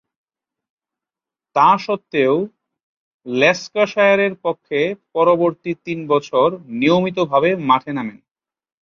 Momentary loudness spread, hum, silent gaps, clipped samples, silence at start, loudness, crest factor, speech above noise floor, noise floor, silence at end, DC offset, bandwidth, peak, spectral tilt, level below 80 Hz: 11 LU; none; 2.83-3.20 s; under 0.1%; 1.55 s; -17 LUFS; 18 dB; 71 dB; -88 dBFS; 0.75 s; under 0.1%; 7.2 kHz; -2 dBFS; -6 dB/octave; -64 dBFS